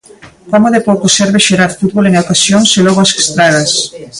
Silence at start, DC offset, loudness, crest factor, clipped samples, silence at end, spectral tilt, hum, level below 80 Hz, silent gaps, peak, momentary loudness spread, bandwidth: 0.25 s; under 0.1%; -9 LUFS; 10 dB; under 0.1%; 0 s; -3.5 dB/octave; none; -46 dBFS; none; 0 dBFS; 4 LU; 11.5 kHz